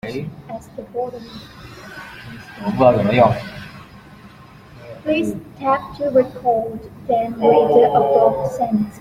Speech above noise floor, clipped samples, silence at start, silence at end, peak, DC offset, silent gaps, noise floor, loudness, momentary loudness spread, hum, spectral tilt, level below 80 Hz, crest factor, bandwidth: 25 dB; under 0.1%; 0.05 s; 0 s; -2 dBFS; under 0.1%; none; -42 dBFS; -18 LUFS; 22 LU; none; -7.5 dB/octave; -50 dBFS; 18 dB; 16 kHz